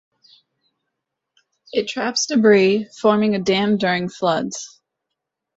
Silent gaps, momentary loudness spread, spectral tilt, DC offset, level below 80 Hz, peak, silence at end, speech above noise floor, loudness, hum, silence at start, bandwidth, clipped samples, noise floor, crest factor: none; 11 LU; -4.5 dB/octave; under 0.1%; -62 dBFS; -2 dBFS; 0.9 s; 63 dB; -18 LUFS; none; 1.75 s; 8 kHz; under 0.1%; -81 dBFS; 18 dB